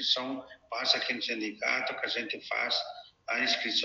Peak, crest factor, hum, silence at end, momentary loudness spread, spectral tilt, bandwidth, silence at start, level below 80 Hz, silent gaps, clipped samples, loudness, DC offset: -10 dBFS; 22 dB; none; 0 s; 12 LU; -1 dB/octave; 7.8 kHz; 0 s; -78 dBFS; none; under 0.1%; -30 LUFS; under 0.1%